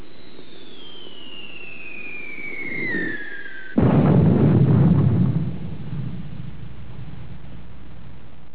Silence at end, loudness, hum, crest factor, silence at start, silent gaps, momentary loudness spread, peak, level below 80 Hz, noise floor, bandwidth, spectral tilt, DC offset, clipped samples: 0.35 s; -20 LUFS; none; 18 dB; 0.4 s; none; 25 LU; -4 dBFS; -40 dBFS; -44 dBFS; 4 kHz; -12 dB/octave; 4%; under 0.1%